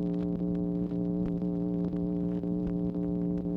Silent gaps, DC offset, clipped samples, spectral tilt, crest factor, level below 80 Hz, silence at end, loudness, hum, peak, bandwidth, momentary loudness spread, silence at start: none; under 0.1%; under 0.1%; -12 dB/octave; 10 dB; -48 dBFS; 0 s; -32 LUFS; none; -20 dBFS; 3.5 kHz; 1 LU; 0 s